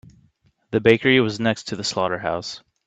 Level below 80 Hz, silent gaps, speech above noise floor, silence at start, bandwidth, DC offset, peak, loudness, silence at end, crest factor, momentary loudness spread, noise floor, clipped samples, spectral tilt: -58 dBFS; none; 41 dB; 0.7 s; 9 kHz; under 0.1%; 0 dBFS; -20 LUFS; 0.3 s; 22 dB; 10 LU; -62 dBFS; under 0.1%; -5 dB/octave